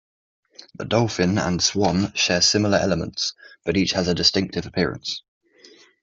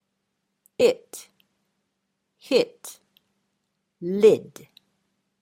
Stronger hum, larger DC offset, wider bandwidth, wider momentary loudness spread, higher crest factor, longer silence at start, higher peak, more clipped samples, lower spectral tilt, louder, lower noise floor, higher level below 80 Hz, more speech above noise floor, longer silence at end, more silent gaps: neither; neither; second, 8 kHz vs 16 kHz; second, 11 LU vs 24 LU; about the same, 20 dB vs 22 dB; about the same, 0.8 s vs 0.8 s; first, -2 dBFS vs -6 dBFS; neither; about the same, -4 dB/octave vs -4.5 dB/octave; about the same, -21 LUFS vs -22 LUFS; second, -51 dBFS vs -78 dBFS; first, -50 dBFS vs -74 dBFS; second, 30 dB vs 56 dB; second, 0.85 s vs 1 s; neither